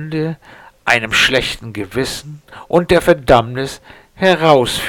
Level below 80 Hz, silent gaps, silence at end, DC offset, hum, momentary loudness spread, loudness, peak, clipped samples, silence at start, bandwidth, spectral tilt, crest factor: -38 dBFS; none; 0 s; under 0.1%; none; 14 LU; -14 LUFS; 0 dBFS; under 0.1%; 0 s; 19 kHz; -4.5 dB/octave; 16 dB